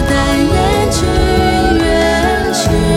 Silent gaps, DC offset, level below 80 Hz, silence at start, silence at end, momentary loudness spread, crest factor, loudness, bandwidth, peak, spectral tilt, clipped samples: none; under 0.1%; -20 dBFS; 0 s; 0 s; 2 LU; 10 dB; -12 LUFS; 17 kHz; 0 dBFS; -5 dB/octave; under 0.1%